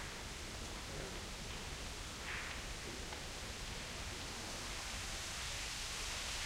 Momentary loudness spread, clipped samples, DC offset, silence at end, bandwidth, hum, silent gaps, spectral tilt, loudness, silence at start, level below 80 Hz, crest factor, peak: 4 LU; under 0.1%; under 0.1%; 0 s; 16 kHz; none; none; -2 dB/octave; -44 LUFS; 0 s; -52 dBFS; 16 dB; -30 dBFS